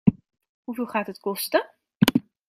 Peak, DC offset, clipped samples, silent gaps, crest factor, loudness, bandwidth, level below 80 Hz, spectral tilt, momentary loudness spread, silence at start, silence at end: -2 dBFS; under 0.1%; under 0.1%; 0.49-0.63 s, 1.96-2.00 s; 24 dB; -25 LUFS; 16 kHz; -56 dBFS; -5.5 dB/octave; 15 LU; 0.05 s; 0.25 s